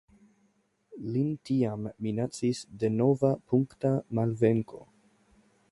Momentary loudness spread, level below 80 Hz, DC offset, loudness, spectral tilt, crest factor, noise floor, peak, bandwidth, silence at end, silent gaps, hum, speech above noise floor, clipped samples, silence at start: 8 LU; -64 dBFS; under 0.1%; -29 LUFS; -8 dB/octave; 18 dB; -70 dBFS; -12 dBFS; 11.5 kHz; 0.9 s; none; none; 42 dB; under 0.1%; 0.9 s